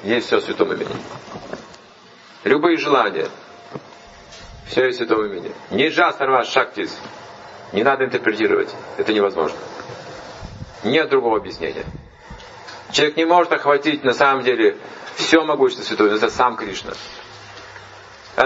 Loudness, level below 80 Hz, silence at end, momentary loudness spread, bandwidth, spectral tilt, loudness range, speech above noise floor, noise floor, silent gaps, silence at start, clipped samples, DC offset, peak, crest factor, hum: -18 LUFS; -52 dBFS; 0 s; 21 LU; 8 kHz; -4 dB/octave; 5 LU; 27 dB; -45 dBFS; none; 0 s; under 0.1%; under 0.1%; 0 dBFS; 20 dB; none